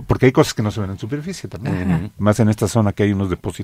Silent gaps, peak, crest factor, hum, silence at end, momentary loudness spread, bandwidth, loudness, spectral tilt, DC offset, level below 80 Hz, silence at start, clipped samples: none; 0 dBFS; 18 dB; none; 0 s; 11 LU; 15.5 kHz; -19 LUFS; -6.5 dB/octave; under 0.1%; -40 dBFS; 0 s; under 0.1%